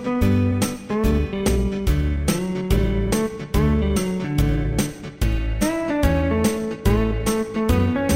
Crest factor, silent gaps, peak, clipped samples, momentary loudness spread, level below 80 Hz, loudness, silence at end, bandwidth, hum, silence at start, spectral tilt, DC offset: 16 dB; none; -4 dBFS; under 0.1%; 4 LU; -26 dBFS; -22 LUFS; 0 s; 16.5 kHz; none; 0 s; -6 dB/octave; 0.4%